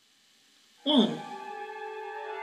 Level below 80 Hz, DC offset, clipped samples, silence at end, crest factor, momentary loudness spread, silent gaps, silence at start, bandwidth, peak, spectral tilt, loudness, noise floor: -88 dBFS; under 0.1%; under 0.1%; 0 s; 22 dB; 15 LU; none; 0.85 s; 11 kHz; -10 dBFS; -5.5 dB/octave; -30 LUFS; -64 dBFS